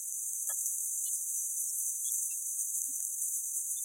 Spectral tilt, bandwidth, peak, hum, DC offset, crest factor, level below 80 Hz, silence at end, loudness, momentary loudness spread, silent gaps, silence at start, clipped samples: 6.5 dB/octave; 16 kHz; -14 dBFS; none; under 0.1%; 22 dB; under -90 dBFS; 0 s; -32 LUFS; 2 LU; none; 0 s; under 0.1%